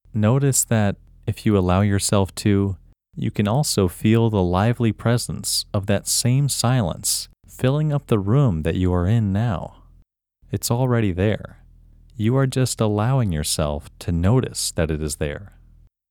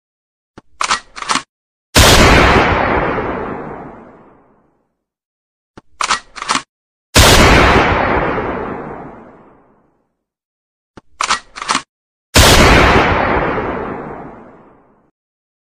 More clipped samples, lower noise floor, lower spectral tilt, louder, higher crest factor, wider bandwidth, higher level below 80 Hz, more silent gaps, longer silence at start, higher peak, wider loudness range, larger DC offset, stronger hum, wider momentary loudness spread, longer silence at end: neither; second, -56 dBFS vs -67 dBFS; first, -5.5 dB/octave vs -3.5 dB/octave; second, -21 LUFS vs -12 LUFS; about the same, 18 dB vs 14 dB; about the same, 19.5 kHz vs 19.5 kHz; second, -40 dBFS vs -24 dBFS; second, none vs 1.49-1.93 s, 5.25-5.74 s, 6.69-7.13 s, 10.45-10.94 s, 11.89-12.33 s; second, 0.15 s vs 0.8 s; second, -4 dBFS vs 0 dBFS; second, 3 LU vs 12 LU; second, under 0.1% vs 0.1%; neither; second, 9 LU vs 18 LU; second, 0.65 s vs 1.35 s